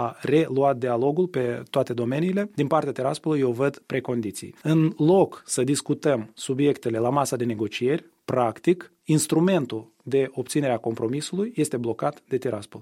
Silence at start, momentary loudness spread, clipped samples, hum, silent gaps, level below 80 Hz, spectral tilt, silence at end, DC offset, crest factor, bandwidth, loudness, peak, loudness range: 0 s; 7 LU; under 0.1%; none; none; -66 dBFS; -6 dB/octave; 0 s; under 0.1%; 18 dB; 16 kHz; -24 LUFS; -6 dBFS; 2 LU